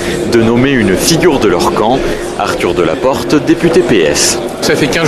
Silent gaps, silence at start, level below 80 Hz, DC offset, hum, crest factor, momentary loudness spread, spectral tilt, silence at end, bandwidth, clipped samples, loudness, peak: none; 0 s; -30 dBFS; 0.5%; none; 10 dB; 5 LU; -4 dB/octave; 0 s; 14 kHz; under 0.1%; -10 LUFS; 0 dBFS